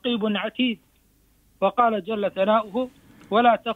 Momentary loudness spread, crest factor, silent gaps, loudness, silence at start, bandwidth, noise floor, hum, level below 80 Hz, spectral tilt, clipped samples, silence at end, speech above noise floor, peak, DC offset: 10 LU; 18 dB; none; -23 LUFS; 0.05 s; 4.5 kHz; -61 dBFS; none; -64 dBFS; -7 dB/octave; under 0.1%; 0 s; 39 dB; -6 dBFS; under 0.1%